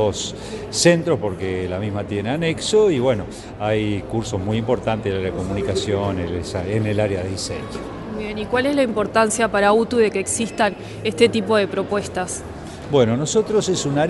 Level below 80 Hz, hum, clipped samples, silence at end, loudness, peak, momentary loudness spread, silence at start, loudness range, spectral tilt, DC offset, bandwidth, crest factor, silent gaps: -44 dBFS; none; under 0.1%; 0 s; -20 LUFS; 0 dBFS; 11 LU; 0 s; 4 LU; -5 dB/octave; under 0.1%; 11.5 kHz; 20 dB; none